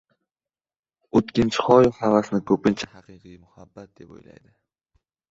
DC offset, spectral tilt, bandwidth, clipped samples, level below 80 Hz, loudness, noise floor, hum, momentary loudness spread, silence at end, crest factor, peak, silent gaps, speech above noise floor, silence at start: under 0.1%; -6.5 dB/octave; 7.8 kHz; under 0.1%; -54 dBFS; -20 LUFS; under -90 dBFS; none; 8 LU; 1.45 s; 22 dB; -2 dBFS; none; over 68 dB; 1.15 s